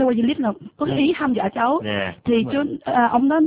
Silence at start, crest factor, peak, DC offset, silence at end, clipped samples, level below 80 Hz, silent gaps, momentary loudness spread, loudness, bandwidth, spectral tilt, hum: 0 s; 14 dB; -6 dBFS; under 0.1%; 0 s; under 0.1%; -52 dBFS; none; 6 LU; -21 LUFS; 4 kHz; -10 dB/octave; none